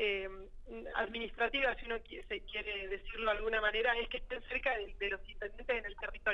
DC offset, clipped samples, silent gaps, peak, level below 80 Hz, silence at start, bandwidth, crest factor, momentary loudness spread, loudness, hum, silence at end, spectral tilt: under 0.1%; under 0.1%; none; -20 dBFS; -50 dBFS; 0 s; 7.4 kHz; 18 dB; 11 LU; -37 LUFS; none; 0 s; -5 dB/octave